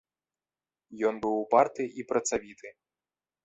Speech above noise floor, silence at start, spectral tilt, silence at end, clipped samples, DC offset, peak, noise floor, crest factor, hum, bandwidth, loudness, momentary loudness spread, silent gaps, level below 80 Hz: over 61 dB; 0.9 s; -4 dB/octave; 0.75 s; under 0.1%; under 0.1%; -8 dBFS; under -90 dBFS; 24 dB; none; 8.4 kHz; -28 LUFS; 23 LU; none; -68 dBFS